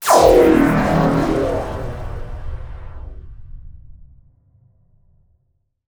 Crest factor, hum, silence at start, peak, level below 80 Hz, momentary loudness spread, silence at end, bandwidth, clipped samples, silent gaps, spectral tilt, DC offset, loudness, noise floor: 18 dB; none; 0 s; 0 dBFS; -32 dBFS; 25 LU; 1.9 s; over 20 kHz; under 0.1%; none; -6 dB/octave; under 0.1%; -15 LUFS; -67 dBFS